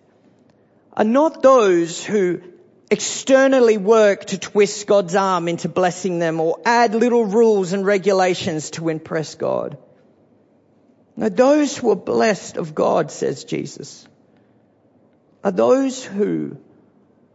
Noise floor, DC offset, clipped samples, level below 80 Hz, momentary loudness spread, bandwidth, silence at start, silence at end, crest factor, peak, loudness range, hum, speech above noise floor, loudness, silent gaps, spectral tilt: -56 dBFS; under 0.1%; under 0.1%; -68 dBFS; 12 LU; 8 kHz; 0.95 s; 0.75 s; 16 dB; -2 dBFS; 7 LU; none; 39 dB; -18 LUFS; none; -5 dB/octave